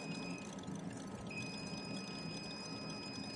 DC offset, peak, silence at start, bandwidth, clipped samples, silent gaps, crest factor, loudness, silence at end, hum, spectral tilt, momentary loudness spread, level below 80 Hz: under 0.1%; -32 dBFS; 0 s; 11.5 kHz; under 0.1%; none; 14 dB; -45 LUFS; 0 s; none; -4.5 dB/octave; 2 LU; -70 dBFS